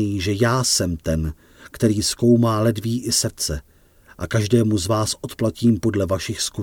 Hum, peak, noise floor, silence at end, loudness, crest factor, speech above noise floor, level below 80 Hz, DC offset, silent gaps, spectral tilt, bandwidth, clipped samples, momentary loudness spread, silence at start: none; -4 dBFS; -51 dBFS; 0 s; -20 LUFS; 16 dB; 31 dB; -40 dBFS; under 0.1%; none; -5 dB/octave; 18 kHz; under 0.1%; 8 LU; 0 s